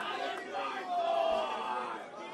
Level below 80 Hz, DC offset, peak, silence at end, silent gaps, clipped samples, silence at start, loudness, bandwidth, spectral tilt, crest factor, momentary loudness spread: -72 dBFS; under 0.1%; -20 dBFS; 0 s; none; under 0.1%; 0 s; -35 LUFS; 12.5 kHz; -3 dB/octave; 14 dB; 7 LU